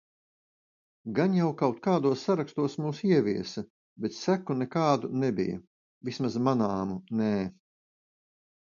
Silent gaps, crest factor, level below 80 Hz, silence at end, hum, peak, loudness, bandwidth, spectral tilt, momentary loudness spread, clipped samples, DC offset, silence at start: 3.70-3.96 s, 5.67-6.01 s; 20 dB; -66 dBFS; 1.15 s; none; -10 dBFS; -29 LUFS; 7.4 kHz; -7 dB/octave; 12 LU; under 0.1%; under 0.1%; 1.05 s